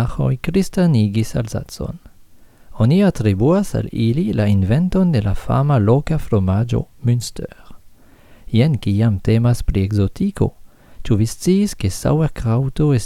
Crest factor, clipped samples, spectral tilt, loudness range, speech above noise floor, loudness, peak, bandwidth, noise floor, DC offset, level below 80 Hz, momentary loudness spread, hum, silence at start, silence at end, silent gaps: 16 dB; under 0.1%; -7.5 dB/octave; 3 LU; 28 dB; -18 LUFS; -2 dBFS; 15 kHz; -45 dBFS; under 0.1%; -32 dBFS; 7 LU; none; 0 s; 0 s; none